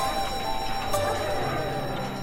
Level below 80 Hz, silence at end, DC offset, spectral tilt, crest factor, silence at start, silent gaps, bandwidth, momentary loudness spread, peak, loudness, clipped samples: -40 dBFS; 0 s; under 0.1%; -4 dB/octave; 16 dB; 0 s; none; 16.5 kHz; 3 LU; -12 dBFS; -28 LUFS; under 0.1%